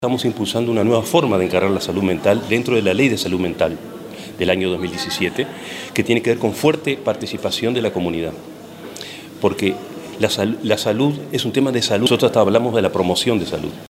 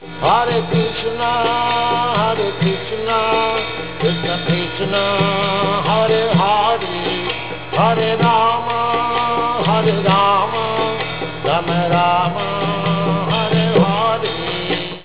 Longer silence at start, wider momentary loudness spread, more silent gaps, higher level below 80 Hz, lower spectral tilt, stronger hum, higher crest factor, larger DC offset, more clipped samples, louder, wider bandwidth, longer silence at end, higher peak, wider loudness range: about the same, 0 s vs 0 s; first, 14 LU vs 6 LU; neither; second, -56 dBFS vs -44 dBFS; second, -5 dB/octave vs -10 dB/octave; neither; about the same, 18 dB vs 16 dB; second, under 0.1% vs 1%; neither; about the same, -18 LUFS vs -17 LUFS; first, 16 kHz vs 4 kHz; about the same, 0.05 s vs 0 s; about the same, 0 dBFS vs -2 dBFS; first, 5 LU vs 2 LU